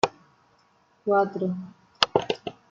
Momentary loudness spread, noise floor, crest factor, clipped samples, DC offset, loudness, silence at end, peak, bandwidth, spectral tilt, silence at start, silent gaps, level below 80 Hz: 12 LU; -63 dBFS; 26 dB; under 0.1%; under 0.1%; -26 LUFS; 0.2 s; -2 dBFS; 8 kHz; -4.5 dB/octave; 0.05 s; none; -66 dBFS